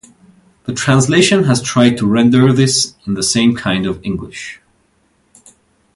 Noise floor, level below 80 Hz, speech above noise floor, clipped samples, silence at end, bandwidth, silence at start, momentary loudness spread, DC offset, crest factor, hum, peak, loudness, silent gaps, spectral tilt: -58 dBFS; -46 dBFS; 45 dB; under 0.1%; 1.4 s; 11.5 kHz; 0.65 s; 14 LU; under 0.1%; 14 dB; none; 0 dBFS; -13 LUFS; none; -4.5 dB/octave